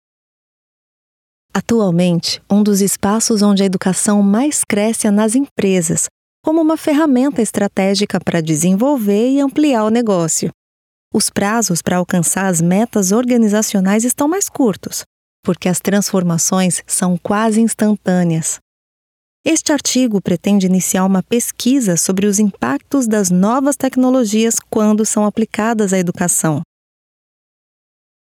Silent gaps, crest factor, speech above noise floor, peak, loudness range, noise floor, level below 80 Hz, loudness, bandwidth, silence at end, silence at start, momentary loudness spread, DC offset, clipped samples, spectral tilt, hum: 5.51-5.56 s, 6.11-6.44 s, 10.54-11.11 s, 15.06-15.43 s, 18.62-19.44 s; 14 dB; over 76 dB; 0 dBFS; 2 LU; under -90 dBFS; -56 dBFS; -15 LUFS; 17 kHz; 1.7 s; 1.55 s; 4 LU; under 0.1%; under 0.1%; -4.5 dB/octave; none